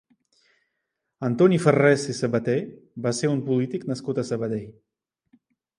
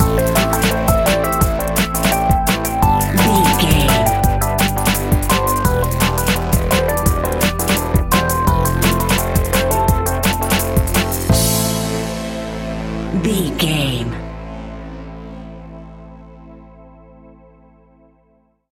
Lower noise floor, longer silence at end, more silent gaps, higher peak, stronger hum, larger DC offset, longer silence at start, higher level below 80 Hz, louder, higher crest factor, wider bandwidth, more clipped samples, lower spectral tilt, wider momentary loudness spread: first, -80 dBFS vs -58 dBFS; second, 1.05 s vs 1.8 s; neither; second, -4 dBFS vs 0 dBFS; neither; neither; first, 1.2 s vs 0 s; second, -66 dBFS vs -24 dBFS; second, -23 LUFS vs -16 LUFS; about the same, 20 dB vs 16 dB; second, 11.5 kHz vs 17 kHz; neither; first, -6.5 dB/octave vs -4.5 dB/octave; second, 12 LU vs 15 LU